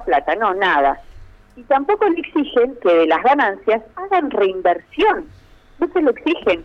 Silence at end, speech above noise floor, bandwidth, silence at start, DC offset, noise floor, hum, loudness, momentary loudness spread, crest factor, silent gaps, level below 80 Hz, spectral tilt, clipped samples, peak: 0 s; 23 dB; 6.8 kHz; 0 s; under 0.1%; -40 dBFS; none; -17 LUFS; 6 LU; 14 dB; none; -46 dBFS; -6 dB/octave; under 0.1%; -4 dBFS